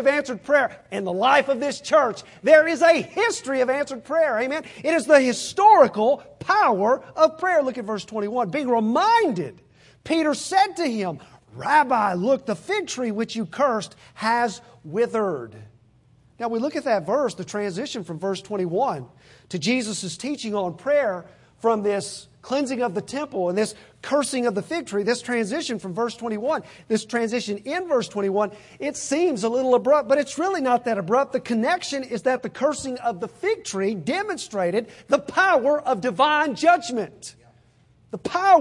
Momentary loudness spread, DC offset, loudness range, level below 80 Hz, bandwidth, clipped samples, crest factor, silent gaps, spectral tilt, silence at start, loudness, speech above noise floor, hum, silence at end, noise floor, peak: 11 LU; under 0.1%; 7 LU; -66 dBFS; 11.5 kHz; under 0.1%; 20 dB; none; -4 dB/octave; 0 s; -22 LUFS; 35 dB; none; 0 s; -57 dBFS; -2 dBFS